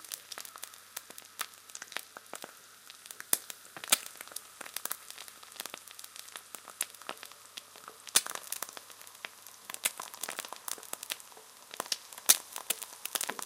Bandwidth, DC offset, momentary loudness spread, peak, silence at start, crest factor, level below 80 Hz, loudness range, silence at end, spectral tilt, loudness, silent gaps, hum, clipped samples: 17 kHz; under 0.1%; 18 LU; -2 dBFS; 0 s; 36 dB; -88 dBFS; 9 LU; 0 s; 2 dB/octave; -35 LUFS; none; none; under 0.1%